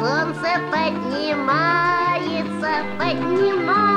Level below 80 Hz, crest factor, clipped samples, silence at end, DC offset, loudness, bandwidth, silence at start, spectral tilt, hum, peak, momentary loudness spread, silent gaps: -60 dBFS; 14 dB; under 0.1%; 0 s; under 0.1%; -20 LUFS; 10.5 kHz; 0 s; -6 dB/octave; none; -6 dBFS; 5 LU; none